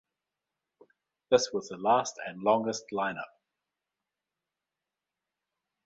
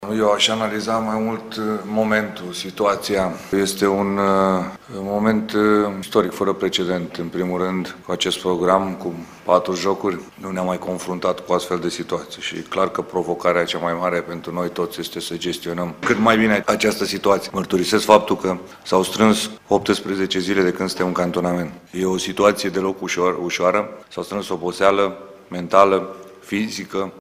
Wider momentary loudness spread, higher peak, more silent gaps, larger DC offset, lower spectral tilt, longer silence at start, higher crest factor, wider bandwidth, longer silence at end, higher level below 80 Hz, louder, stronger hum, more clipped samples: about the same, 10 LU vs 11 LU; second, -8 dBFS vs 0 dBFS; neither; neither; about the same, -3.5 dB/octave vs -4.5 dB/octave; first, 1.3 s vs 0 s; about the same, 24 dB vs 20 dB; second, 8.2 kHz vs 16 kHz; first, 2.6 s vs 0 s; second, -74 dBFS vs -54 dBFS; second, -29 LUFS vs -20 LUFS; neither; neither